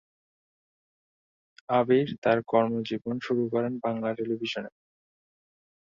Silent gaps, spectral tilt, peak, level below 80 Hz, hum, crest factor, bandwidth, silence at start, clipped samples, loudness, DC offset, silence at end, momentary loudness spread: 2.18-2.22 s; -7 dB/octave; -8 dBFS; -70 dBFS; none; 22 dB; 7.4 kHz; 1.7 s; under 0.1%; -27 LUFS; under 0.1%; 1.15 s; 9 LU